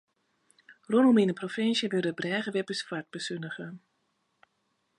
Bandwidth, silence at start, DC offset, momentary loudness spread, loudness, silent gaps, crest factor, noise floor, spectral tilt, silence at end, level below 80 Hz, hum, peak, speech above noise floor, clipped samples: 10.5 kHz; 0.7 s; under 0.1%; 15 LU; -28 LUFS; none; 18 dB; -76 dBFS; -5.5 dB/octave; 1.2 s; -80 dBFS; none; -12 dBFS; 48 dB; under 0.1%